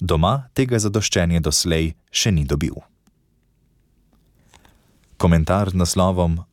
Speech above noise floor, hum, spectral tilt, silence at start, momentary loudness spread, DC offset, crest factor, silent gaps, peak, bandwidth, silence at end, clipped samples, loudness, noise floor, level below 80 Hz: 43 dB; none; -5 dB/octave; 0 s; 5 LU; under 0.1%; 16 dB; none; -4 dBFS; 17 kHz; 0.1 s; under 0.1%; -19 LUFS; -62 dBFS; -34 dBFS